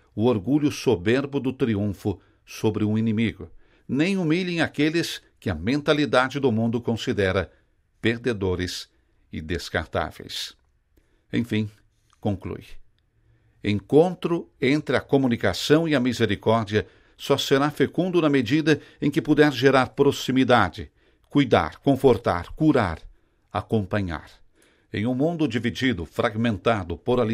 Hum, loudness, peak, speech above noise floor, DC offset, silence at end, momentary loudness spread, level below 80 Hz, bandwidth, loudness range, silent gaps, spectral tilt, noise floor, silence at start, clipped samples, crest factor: none; -23 LUFS; -4 dBFS; 40 dB; under 0.1%; 0 s; 12 LU; -50 dBFS; 16 kHz; 9 LU; none; -6 dB/octave; -63 dBFS; 0.15 s; under 0.1%; 20 dB